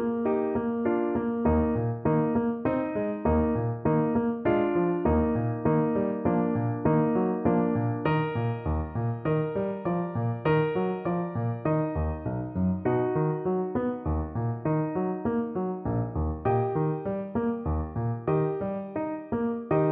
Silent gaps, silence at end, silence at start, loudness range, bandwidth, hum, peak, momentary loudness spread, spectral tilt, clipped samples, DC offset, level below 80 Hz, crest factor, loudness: none; 0 s; 0 s; 3 LU; 4 kHz; none; -10 dBFS; 6 LU; -12 dB/octave; under 0.1%; under 0.1%; -42 dBFS; 16 dB; -28 LUFS